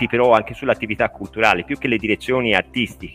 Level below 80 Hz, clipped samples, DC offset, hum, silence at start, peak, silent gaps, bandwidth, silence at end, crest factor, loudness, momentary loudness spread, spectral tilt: -46 dBFS; under 0.1%; under 0.1%; none; 0 s; 0 dBFS; none; 15.5 kHz; 0 s; 18 dB; -19 LUFS; 7 LU; -5.5 dB/octave